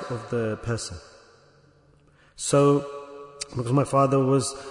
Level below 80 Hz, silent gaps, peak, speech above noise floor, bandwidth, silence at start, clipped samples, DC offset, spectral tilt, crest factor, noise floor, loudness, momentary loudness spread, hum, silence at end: -56 dBFS; none; -8 dBFS; 35 dB; 11 kHz; 0 s; under 0.1%; under 0.1%; -6 dB/octave; 16 dB; -58 dBFS; -24 LUFS; 17 LU; none; 0 s